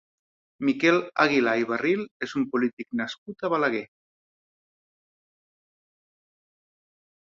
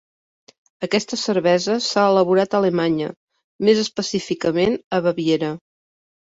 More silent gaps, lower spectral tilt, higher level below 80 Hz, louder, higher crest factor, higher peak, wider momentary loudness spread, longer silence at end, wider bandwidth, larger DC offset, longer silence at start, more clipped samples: second, 2.11-2.20 s, 2.73-2.77 s, 3.18-3.26 s vs 3.17-3.28 s, 3.44-3.59 s, 4.84-4.91 s; about the same, -5.5 dB/octave vs -5 dB/octave; second, -72 dBFS vs -60 dBFS; second, -25 LUFS vs -20 LUFS; about the same, 22 dB vs 18 dB; about the same, -6 dBFS vs -4 dBFS; about the same, 10 LU vs 8 LU; first, 3.35 s vs 0.75 s; about the same, 7.4 kHz vs 8 kHz; neither; second, 0.6 s vs 0.8 s; neither